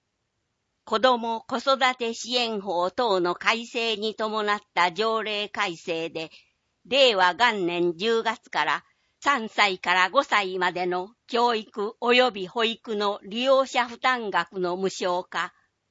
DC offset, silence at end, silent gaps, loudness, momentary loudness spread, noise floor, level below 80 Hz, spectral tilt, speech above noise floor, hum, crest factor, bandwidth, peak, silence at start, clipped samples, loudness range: under 0.1%; 0.4 s; none; -24 LUFS; 9 LU; -77 dBFS; -74 dBFS; -3 dB/octave; 52 dB; none; 20 dB; 8 kHz; -4 dBFS; 0.85 s; under 0.1%; 2 LU